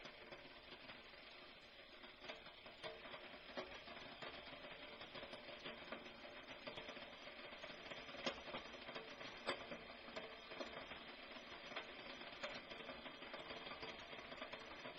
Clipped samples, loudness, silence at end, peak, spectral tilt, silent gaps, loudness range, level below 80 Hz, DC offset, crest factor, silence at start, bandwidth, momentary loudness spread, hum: under 0.1%; -53 LUFS; 0 s; -30 dBFS; -0.5 dB/octave; none; 4 LU; -76 dBFS; under 0.1%; 26 dB; 0 s; 7 kHz; 8 LU; none